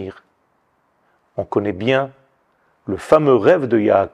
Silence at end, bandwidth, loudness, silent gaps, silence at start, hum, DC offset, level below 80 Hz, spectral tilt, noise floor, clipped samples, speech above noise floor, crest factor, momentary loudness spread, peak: 0.05 s; 11 kHz; -17 LUFS; none; 0 s; none; under 0.1%; -56 dBFS; -7.5 dB/octave; -63 dBFS; under 0.1%; 48 dB; 18 dB; 18 LU; 0 dBFS